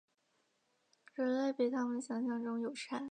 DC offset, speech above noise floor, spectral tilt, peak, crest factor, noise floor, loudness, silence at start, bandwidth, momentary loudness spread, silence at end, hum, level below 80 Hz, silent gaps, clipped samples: under 0.1%; 42 dB; -4.5 dB/octave; -24 dBFS; 16 dB; -79 dBFS; -37 LUFS; 1.15 s; 9.6 kHz; 6 LU; 0 s; none; under -90 dBFS; none; under 0.1%